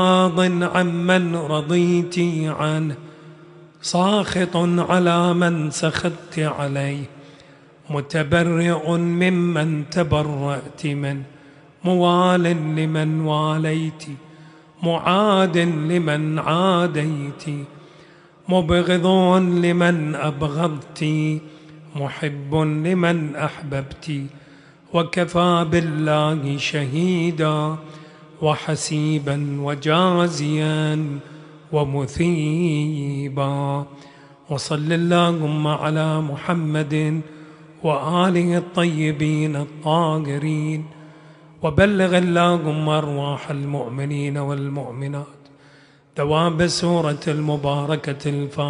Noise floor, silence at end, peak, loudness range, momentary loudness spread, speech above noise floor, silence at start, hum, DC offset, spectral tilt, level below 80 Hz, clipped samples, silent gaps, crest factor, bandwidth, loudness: -51 dBFS; 0 s; -2 dBFS; 3 LU; 11 LU; 31 dB; 0 s; none; under 0.1%; -6 dB/octave; -50 dBFS; under 0.1%; none; 20 dB; 10.5 kHz; -20 LUFS